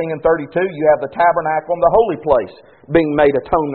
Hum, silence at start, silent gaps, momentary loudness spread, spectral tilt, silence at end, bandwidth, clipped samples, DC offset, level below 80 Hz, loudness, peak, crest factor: none; 0 s; none; 5 LU; -5.5 dB/octave; 0 s; 4.4 kHz; under 0.1%; under 0.1%; -42 dBFS; -16 LUFS; 0 dBFS; 16 dB